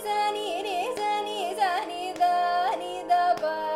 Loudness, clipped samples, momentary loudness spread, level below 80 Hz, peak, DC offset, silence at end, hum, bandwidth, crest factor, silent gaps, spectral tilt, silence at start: -27 LUFS; under 0.1%; 7 LU; -66 dBFS; -12 dBFS; under 0.1%; 0 s; none; 15.5 kHz; 14 dB; none; -2 dB/octave; 0 s